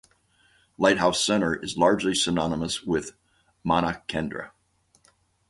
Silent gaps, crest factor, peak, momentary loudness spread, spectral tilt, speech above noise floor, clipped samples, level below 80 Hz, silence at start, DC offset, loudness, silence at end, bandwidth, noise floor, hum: none; 22 dB; -4 dBFS; 13 LU; -4 dB/octave; 42 dB; under 0.1%; -52 dBFS; 0.8 s; under 0.1%; -24 LUFS; 1 s; 11.5 kHz; -66 dBFS; none